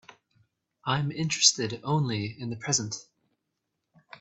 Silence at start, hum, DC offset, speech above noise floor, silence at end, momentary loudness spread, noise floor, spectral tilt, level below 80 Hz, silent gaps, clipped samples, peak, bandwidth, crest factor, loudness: 0.85 s; none; under 0.1%; 54 dB; 1.2 s; 15 LU; -82 dBFS; -3 dB/octave; -68 dBFS; none; under 0.1%; -6 dBFS; 8.4 kHz; 26 dB; -27 LUFS